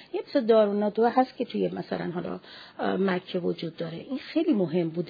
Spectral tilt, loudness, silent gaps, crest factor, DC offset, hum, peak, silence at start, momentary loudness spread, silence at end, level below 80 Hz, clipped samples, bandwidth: -9 dB/octave; -27 LUFS; none; 18 dB; under 0.1%; none; -10 dBFS; 0 s; 13 LU; 0 s; -72 dBFS; under 0.1%; 5 kHz